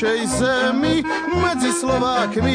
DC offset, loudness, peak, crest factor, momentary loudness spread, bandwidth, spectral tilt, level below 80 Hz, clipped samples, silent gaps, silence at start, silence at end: under 0.1%; -19 LUFS; -8 dBFS; 12 dB; 2 LU; 10.5 kHz; -4.5 dB/octave; -40 dBFS; under 0.1%; none; 0 s; 0 s